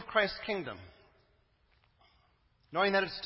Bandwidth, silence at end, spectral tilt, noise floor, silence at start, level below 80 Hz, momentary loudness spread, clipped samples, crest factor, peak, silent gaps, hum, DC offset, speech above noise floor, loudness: 5.8 kHz; 0 s; -7.5 dB/octave; -70 dBFS; 0 s; -64 dBFS; 14 LU; under 0.1%; 24 dB; -12 dBFS; none; none; under 0.1%; 38 dB; -32 LUFS